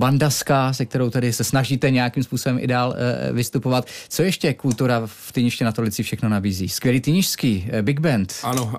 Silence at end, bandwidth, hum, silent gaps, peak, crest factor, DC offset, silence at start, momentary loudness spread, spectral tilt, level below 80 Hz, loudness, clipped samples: 0 s; 15.5 kHz; none; none; -6 dBFS; 14 dB; under 0.1%; 0 s; 5 LU; -5.5 dB/octave; -54 dBFS; -21 LUFS; under 0.1%